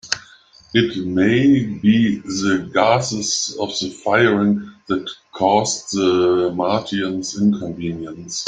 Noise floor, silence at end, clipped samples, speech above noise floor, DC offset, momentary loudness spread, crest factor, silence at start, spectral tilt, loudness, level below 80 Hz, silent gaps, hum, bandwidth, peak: -48 dBFS; 0 s; under 0.1%; 30 dB; under 0.1%; 10 LU; 18 dB; 0.05 s; -4.5 dB/octave; -18 LUFS; -56 dBFS; none; none; 9.4 kHz; 0 dBFS